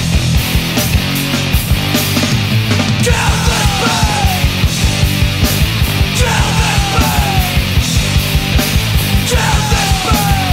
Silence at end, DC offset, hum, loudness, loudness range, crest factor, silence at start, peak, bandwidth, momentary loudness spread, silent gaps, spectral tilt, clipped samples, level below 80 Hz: 0 s; under 0.1%; none; -12 LUFS; 0 LU; 12 dB; 0 s; 0 dBFS; 16.5 kHz; 1 LU; none; -4 dB/octave; under 0.1%; -18 dBFS